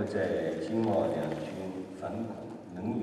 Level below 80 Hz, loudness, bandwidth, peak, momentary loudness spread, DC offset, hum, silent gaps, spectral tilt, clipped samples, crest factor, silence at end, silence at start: -64 dBFS; -34 LUFS; 13 kHz; -16 dBFS; 10 LU; under 0.1%; none; none; -7.5 dB/octave; under 0.1%; 16 dB; 0 s; 0 s